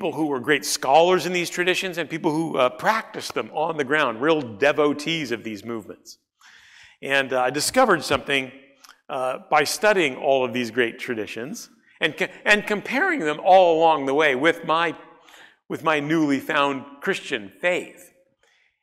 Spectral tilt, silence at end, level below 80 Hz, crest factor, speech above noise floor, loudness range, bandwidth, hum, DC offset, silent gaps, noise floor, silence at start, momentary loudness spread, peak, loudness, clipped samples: -3.5 dB/octave; 0.9 s; -64 dBFS; 18 dB; 42 dB; 5 LU; 16 kHz; none; under 0.1%; none; -64 dBFS; 0 s; 12 LU; -4 dBFS; -21 LUFS; under 0.1%